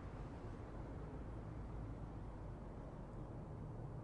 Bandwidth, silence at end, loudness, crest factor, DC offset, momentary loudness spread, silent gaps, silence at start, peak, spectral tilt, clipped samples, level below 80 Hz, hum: 10.5 kHz; 0 s; -52 LUFS; 12 dB; under 0.1%; 2 LU; none; 0 s; -38 dBFS; -9 dB/octave; under 0.1%; -54 dBFS; none